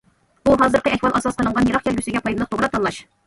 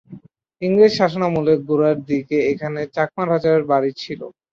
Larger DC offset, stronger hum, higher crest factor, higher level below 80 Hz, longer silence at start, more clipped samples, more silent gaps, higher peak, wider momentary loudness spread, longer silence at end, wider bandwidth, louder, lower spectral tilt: neither; neither; about the same, 16 dB vs 16 dB; first, -42 dBFS vs -58 dBFS; first, 0.45 s vs 0.1 s; neither; neither; about the same, -4 dBFS vs -2 dBFS; second, 7 LU vs 11 LU; about the same, 0.25 s vs 0.25 s; first, 11.5 kHz vs 7.4 kHz; about the same, -19 LUFS vs -18 LUFS; second, -5.5 dB/octave vs -7 dB/octave